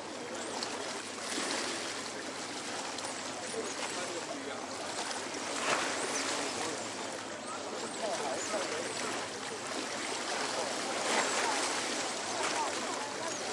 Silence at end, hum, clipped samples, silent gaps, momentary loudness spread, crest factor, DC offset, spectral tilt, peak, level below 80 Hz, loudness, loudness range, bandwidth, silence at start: 0 s; none; under 0.1%; none; 8 LU; 22 dB; under 0.1%; -1 dB/octave; -16 dBFS; -82 dBFS; -35 LUFS; 4 LU; 11.5 kHz; 0 s